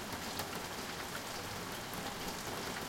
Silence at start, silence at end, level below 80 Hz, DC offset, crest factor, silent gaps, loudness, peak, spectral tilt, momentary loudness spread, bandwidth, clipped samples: 0 s; 0 s; -60 dBFS; under 0.1%; 22 dB; none; -41 LUFS; -20 dBFS; -3 dB/octave; 2 LU; 17 kHz; under 0.1%